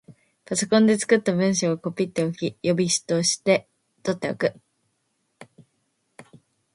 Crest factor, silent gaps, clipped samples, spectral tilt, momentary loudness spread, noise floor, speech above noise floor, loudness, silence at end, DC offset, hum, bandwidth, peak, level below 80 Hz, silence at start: 20 dB; none; under 0.1%; -4.5 dB/octave; 9 LU; -73 dBFS; 51 dB; -23 LUFS; 0.55 s; under 0.1%; none; 11.5 kHz; -4 dBFS; -66 dBFS; 0.1 s